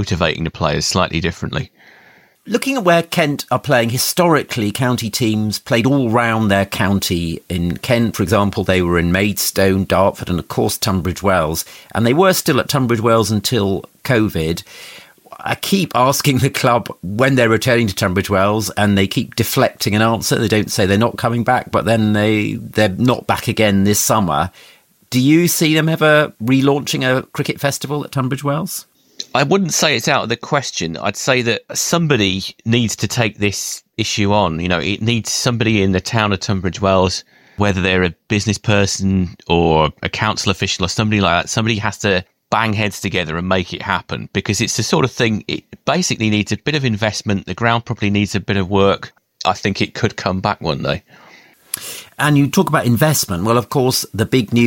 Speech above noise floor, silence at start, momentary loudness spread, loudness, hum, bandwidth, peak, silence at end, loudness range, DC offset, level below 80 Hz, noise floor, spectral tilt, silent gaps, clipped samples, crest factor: 30 dB; 0 s; 7 LU; -16 LUFS; none; 17 kHz; 0 dBFS; 0 s; 3 LU; under 0.1%; -42 dBFS; -46 dBFS; -4.5 dB/octave; none; under 0.1%; 16 dB